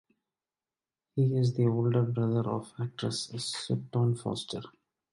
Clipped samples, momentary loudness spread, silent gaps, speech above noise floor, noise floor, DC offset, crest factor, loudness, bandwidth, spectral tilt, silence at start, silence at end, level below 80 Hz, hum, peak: under 0.1%; 10 LU; none; over 61 dB; under -90 dBFS; under 0.1%; 16 dB; -31 LUFS; 11.5 kHz; -6.5 dB/octave; 1.15 s; 0.45 s; -66 dBFS; none; -14 dBFS